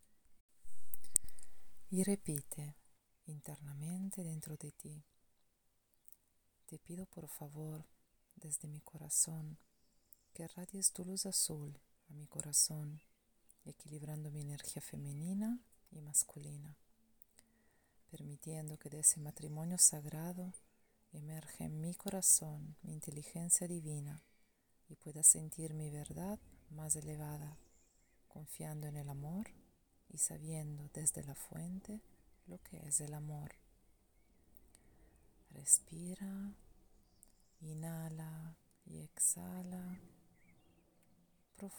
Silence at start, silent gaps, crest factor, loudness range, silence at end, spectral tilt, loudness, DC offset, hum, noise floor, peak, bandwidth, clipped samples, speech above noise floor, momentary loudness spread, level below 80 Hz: 0.1 s; 0.40-0.49 s; 36 dB; 13 LU; 0 s; -3.5 dB/octave; -37 LUFS; under 0.1%; none; -78 dBFS; -6 dBFS; over 20 kHz; under 0.1%; 37 dB; 23 LU; -70 dBFS